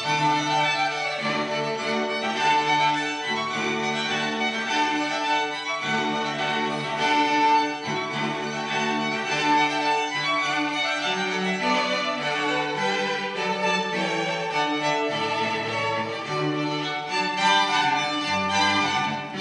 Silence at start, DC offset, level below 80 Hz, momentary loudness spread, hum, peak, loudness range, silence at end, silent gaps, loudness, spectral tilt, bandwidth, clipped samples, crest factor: 0 s; under 0.1%; -70 dBFS; 6 LU; none; -8 dBFS; 2 LU; 0 s; none; -24 LUFS; -3.5 dB/octave; 10 kHz; under 0.1%; 16 dB